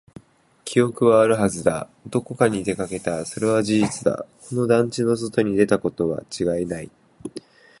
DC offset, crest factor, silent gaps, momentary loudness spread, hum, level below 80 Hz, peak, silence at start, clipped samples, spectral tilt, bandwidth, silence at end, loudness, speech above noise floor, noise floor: under 0.1%; 20 dB; none; 15 LU; none; -54 dBFS; -2 dBFS; 0.65 s; under 0.1%; -6 dB/octave; 11.5 kHz; 0.4 s; -22 LUFS; 27 dB; -48 dBFS